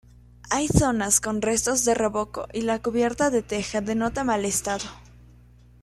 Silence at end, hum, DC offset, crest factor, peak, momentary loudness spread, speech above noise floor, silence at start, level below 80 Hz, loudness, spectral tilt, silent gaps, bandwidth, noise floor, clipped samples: 0.8 s; 60 Hz at -45 dBFS; under 0.1%; 20 dB; -4 dBFS; 8 LU; 28 dB; 0.45 s; -44 dBFS; -24 LUFS; -4 dB/octave; none; 14.5 kHz; -52 dBFS; under 0.1%